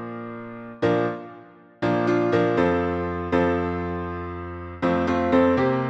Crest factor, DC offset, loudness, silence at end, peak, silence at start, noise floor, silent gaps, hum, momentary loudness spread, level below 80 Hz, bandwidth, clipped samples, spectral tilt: 16 dB; under 0.1%; -23 LUFS; 0 s; -8 dBFS; 0 s; -47 dBFS; none; none; 15 LU; -48 dBFS; 8 kHz; under 0.1%; -8 dB/octave